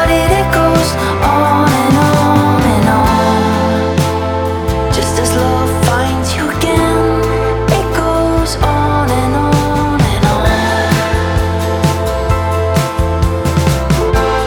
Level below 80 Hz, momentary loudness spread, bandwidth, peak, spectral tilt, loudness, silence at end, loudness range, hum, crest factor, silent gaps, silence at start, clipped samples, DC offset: -22 dBFS; 4 LU; 19.5 kHz; 0 dBFS; -5.5 dB/octave; -12 LUFS; 0 s; 3 LU; none; 12 dB; none; 0 s; under 0.1%; under 0.1%